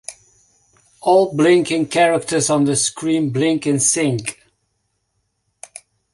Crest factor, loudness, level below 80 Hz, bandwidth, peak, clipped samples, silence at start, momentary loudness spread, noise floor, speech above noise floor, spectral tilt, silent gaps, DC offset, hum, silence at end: 16 dB; -16 LUFS; -58 dBFS; 11.5 kHz; -2 dBFS; under 0.1%; 0.1 s; 16 LU; -70 dBFS; 54 dB; -4 dB/octave; none; under 0.1%; none; 1.8 s